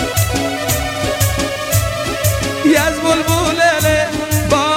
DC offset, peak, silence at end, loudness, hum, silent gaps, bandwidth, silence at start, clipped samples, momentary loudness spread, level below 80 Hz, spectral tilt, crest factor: under 0.1%; 0 dBFS; 0 s; -15 LUFS; none; none; 17 kHz; 0 s; under 0.1%; 5 LU; -30 dBFS; -4 dB/octave; 14 dB